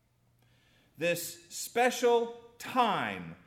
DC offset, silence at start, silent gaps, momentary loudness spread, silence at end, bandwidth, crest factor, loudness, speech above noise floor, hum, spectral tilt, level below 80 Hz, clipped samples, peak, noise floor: under 0.1%; 1 s; none; 12 LU; 0.15 s; 17 kHz; 18 dB; -31 LUFS; 38 dB; none; -3 dB/octave; -76 dBFS; under 0.1%; -14 dBFS; -69 dBFS